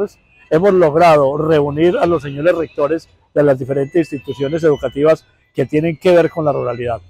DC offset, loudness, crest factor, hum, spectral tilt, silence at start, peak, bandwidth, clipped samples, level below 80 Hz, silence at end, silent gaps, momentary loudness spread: under 0.1%; -15 LUFS; 10 dB; none; -7.5 dB/octave; 0 s; -4 dBFS; 14 kHz; under 0.1%; -48 dBFS; 0.1 s; none; 10 LU